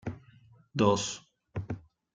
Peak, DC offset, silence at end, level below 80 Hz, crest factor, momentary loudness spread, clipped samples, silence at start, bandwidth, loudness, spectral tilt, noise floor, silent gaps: -10 dBFS; under 0.1%; 0.35 s; -58 dBFS; 24 dB; 17 LU; under 0.1%; 0.05 s; 9.6 kHz; -32 LUFS; -5 dB/octave; -59 dBFS; none